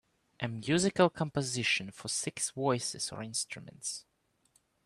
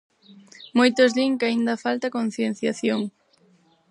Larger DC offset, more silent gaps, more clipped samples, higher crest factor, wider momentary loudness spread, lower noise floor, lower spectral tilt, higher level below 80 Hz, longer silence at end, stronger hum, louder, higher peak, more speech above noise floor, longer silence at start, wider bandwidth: neither; neither; neither; about the same, 22 dB vs 20 dB; first, 11 LU vs 8 LU; first, -72 dBFS vs -60 dBFS; about the same, -3.5 dB/octave vs -4.5 dB/octave; first, -68 dBFS vs -76 dBFS; about the same, 0.85 s vs 0.8 s; neither; second, -32 LUFS vs -22 LUFS; second, -12 dBFS vs -4 dBFS; about the same, 39 dB vs 38 dB; second, 0.4 s vs 0.6 s; first, 13 kHz vs 11 kHz